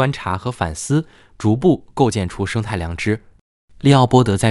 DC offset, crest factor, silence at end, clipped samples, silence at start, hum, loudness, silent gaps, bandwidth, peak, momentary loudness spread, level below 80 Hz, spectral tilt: under 0.1%; 18 dB; 0 s; under 0.1%; 0 s; none; -18 LUFS; 3.41-3.68 s; 12 kHz; 0 dBFS; 10 LU; -40 dBFS; -6 dB/octave